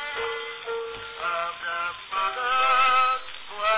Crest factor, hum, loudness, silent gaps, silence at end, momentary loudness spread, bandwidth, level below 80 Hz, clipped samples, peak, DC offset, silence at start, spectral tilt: 16 dB; none; -25 LUFS; none; 0 s; 13 LU; 4 kHz; -60 dBFS; under 0.1%; -10 dBFS; under 0.1%; 0 s; -4.5 dB/octave